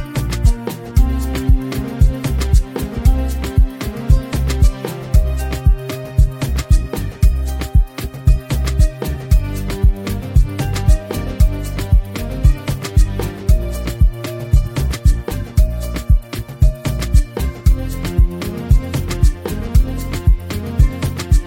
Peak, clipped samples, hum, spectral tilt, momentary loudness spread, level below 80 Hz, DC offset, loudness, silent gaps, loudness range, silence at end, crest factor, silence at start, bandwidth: 0 dBFS; under 0.1%; none; -6.5 dB/octave; 6 LU; -16 dBFS; under 0.1%; -18 LUFS; none; 1 LU; 0 s; 14 dB; 0 s; 17 kHz